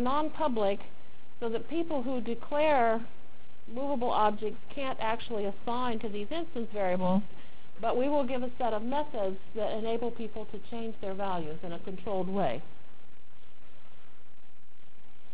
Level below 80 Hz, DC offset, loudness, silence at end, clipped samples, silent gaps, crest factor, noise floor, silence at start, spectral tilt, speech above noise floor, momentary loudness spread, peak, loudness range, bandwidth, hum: -60 dBFS; 4%; -33 LUFS; 2.6 s; under 0.1%; none; 20 dB; -63 dBFS; 0 s; -9.5 dB/octave; 31 dB; 12 LU; -14 dBFS; 6 LU; 4 kHz; none